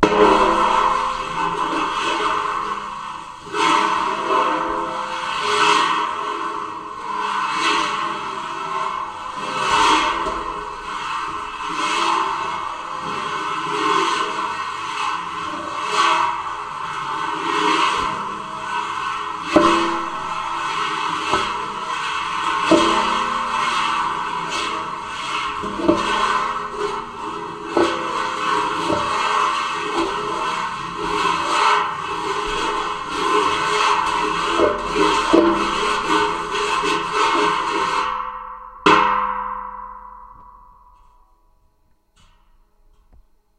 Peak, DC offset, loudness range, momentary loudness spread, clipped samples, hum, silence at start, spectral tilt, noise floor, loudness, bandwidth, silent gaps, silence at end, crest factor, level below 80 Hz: 0 dBFS; under 0.1%; 4 LU; 11 LU; under 0.1%; none; 0 s; -3 dB/octave; -59 dBFS; -20 LUFS; 13.5 kHz; none; 2.95 s; 20 dB; -46 dBFS